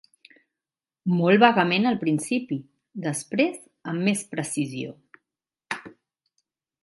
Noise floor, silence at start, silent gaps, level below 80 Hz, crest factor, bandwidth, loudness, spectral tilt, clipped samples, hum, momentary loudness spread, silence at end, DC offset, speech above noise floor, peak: under -90 dBFS; 1.05 s; none; -72 dBFS; 24 dB; 11.5 kHz; -24 LUFS; -5 dB/octave; under 0.1%; none; 17 LU; 0.95 s; under 0.1%; over 67 dB; -2 dBFS